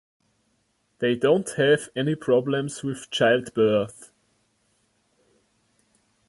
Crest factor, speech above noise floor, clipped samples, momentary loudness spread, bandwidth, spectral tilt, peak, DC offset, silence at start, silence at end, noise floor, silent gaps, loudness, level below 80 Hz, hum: 18 dB; 47 dB; under 0.1%; 8 LU; 11.5 kHz; -5 dB/octave; -8 dBFS; under 0.1%; 1 s; 2.25 s; -70 dBFS; none; -23 LUFS; -66 dBFS; none